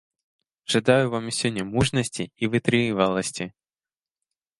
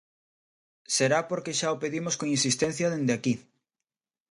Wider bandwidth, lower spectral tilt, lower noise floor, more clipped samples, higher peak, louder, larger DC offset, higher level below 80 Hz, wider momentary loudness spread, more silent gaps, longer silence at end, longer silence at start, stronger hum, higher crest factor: about the same, 11.5 kHz vs 11.5 kHz; about the same, -4.5 dB/octave vs -3.5 dB/octave; about the same, under -90 dBFS vs under -90 dBFS; neither; first, -4 dBFS vs -12 dBFS; first, -23 LUFS vs -27 LUFS; neither; first, -52 dBFS vs -70 dBFS; first, 10 LU vs 6 LU; neither; first, 1.1 s vs 0.9 s; second, 0.7 s vs 0.9 s; neither; about the same, 22 dB vs 18 dB